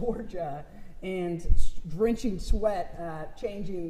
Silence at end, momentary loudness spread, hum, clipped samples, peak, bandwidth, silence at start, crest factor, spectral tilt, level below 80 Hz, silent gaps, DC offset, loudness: 0 s; 10 LU; none; under 0.1%; -8 dBFS; 9.2 kHz; 0 s; 18 dB; -7 dB/octave; -32 dBFS; none; under 0.1%; -32 LUFS